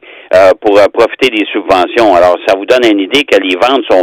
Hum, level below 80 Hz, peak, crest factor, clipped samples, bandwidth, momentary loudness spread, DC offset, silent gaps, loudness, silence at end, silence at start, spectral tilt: none; -44 dBFS; 0 dBFS; 8 dB; 2%; 17.5 kHz; 4 LU; under 0.1%; none; -8 LUFS; 0 s; 0.1 s; -4 dB/octave